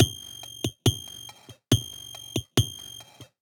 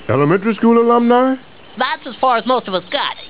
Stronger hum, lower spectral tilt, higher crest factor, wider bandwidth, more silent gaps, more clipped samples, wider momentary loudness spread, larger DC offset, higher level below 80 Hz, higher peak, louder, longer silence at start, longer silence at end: neither; second, -4.5 dB/octave vs -10 dB/octave; first, 26 dB vs 14 dB; first, over 20 kHz vs 4 kHz; neither; neither; first, 16 LU vs 8 LU; second, under 0.1% vs 0.8%; about the same, -50 dBFS vs -54 dBFS; about the same, -2 dBFS vs 0 dBFS; second, -28 LUFS vs -15 LUFS; about the same, 0 s vs 0 s; first, 0.2 s vs 0 s